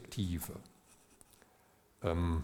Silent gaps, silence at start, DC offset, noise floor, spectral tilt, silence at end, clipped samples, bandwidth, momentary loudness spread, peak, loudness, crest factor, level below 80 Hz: none; 0 s; under 0.1%; -68 dBFS; -6.5 dB/octave; 0 s; under 0.1%; 18.5 kHz; 26 LU; -18 dBFS; -38 LUFS; 22 dB; -52 dBFS